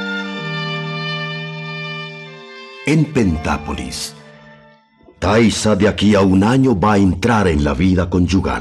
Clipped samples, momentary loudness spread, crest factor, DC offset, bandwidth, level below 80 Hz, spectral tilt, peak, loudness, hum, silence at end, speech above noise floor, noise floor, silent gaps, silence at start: under 0.1%; 13 LU; 12 dB; under 0.1%; 13 kHz; -34 dBFS; -6 dB/octave; -4 dBFS; -16 LUFS; none; 0 s; 34 dB; -48 dBFS; none; 0 s